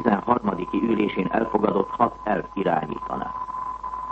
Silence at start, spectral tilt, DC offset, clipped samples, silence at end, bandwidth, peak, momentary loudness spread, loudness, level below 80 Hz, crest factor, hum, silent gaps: 0 s; -8.5 dB/octave; under 0.1%; under 0.1%; 0 s; 7.8 kHz; -4 dBFS; 8 LU; -25 LUFS; -50 dBFS; 20 dB; none; none